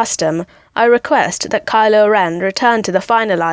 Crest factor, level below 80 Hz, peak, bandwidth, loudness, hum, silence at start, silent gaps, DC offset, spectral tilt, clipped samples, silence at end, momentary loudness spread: 12 dB; -54 dBFS; 0 dBFS; 8 kHz; -14 LUFS; none; 0 s; none; under 0.1%; -3.5 dB/octave; under 0.1%; 0 s; 7 LU